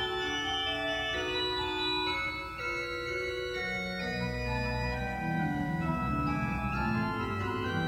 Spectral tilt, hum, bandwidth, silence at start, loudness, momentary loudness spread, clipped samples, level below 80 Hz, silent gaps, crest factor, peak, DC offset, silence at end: -5 dB/octave; none; 16 kHz; 0 s; -32 LUFS; 4 LU; under 0.1%; -46 dBFS; none; 14 dB; -20 dBFS; under 0.1%; 0 s